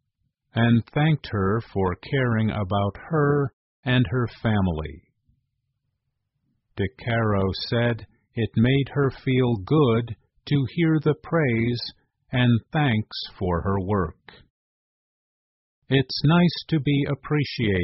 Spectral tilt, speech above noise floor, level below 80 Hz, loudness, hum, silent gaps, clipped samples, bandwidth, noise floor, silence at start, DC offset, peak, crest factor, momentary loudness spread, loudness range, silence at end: -6 dB/octave; 55 dB; -48 dBFS; -24 LUFS; none; 3.53-3.83 s, 14.50-15.82 s; under 0.1%; 6 kHz; -77 dBFS; 0.55 s; under 0.1%; -8 dBFS; 16 dB; 10 LU; 5 LU; 0 s